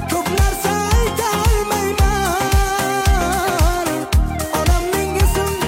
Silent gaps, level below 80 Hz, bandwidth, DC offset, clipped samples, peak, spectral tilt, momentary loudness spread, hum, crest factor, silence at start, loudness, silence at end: none; -20 dBFS; 16.5 kHz; under 0.1%; under 0.1%; -4 dBFS; -4.5 dB/octave; 2 LU; none; 12 dB; 0 s; -17 LUFS; 0 s